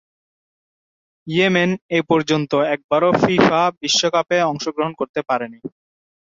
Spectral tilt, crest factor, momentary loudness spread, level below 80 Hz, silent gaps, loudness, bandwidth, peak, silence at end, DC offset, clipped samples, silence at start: -4.5 dB/octave; 18 dB; 8 LU; -58 dBFS; 1.82-1.89 s, 2.84-2.89 s, 3.77-3.81 s, 5.09-5.14 s; -18 LUFS; 7.8 kHz; -2 dBFS; 0.7 s; under 0.1%; under 0.1%; 1.25 s